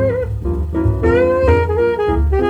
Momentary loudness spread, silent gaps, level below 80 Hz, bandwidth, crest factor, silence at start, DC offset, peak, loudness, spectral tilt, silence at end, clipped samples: 7 LU; none; -22 dBFS; 7.8 kHz; 14 dB; 0 s; under 0.1%; -2 dBFS; -16 LUFS; -9 dB/octave; 0 s; under 0.1%